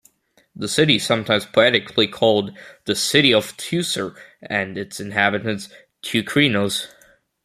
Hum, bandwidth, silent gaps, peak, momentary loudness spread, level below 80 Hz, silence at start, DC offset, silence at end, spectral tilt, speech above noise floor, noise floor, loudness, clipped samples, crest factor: none; 15.5 kHz; none; 0 dBFS; 15 LU; -60 dBFS; 0.6 s; under 0.1%; 0.55 s; -3.5 dB/octave; 39 dB; -59 dBFS; -19 LUFS; under 0.1%; 20 dB